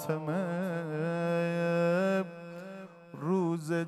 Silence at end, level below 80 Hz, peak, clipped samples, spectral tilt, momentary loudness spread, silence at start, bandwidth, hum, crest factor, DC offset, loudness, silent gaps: 0 s; -88 dBFS; -18 dBFS; under 0.1%; -7.5 dB/octave; 16 LU; 0 s; 13.5 kHz; none; 14 dB; under 0.1%; -31 LUFS; none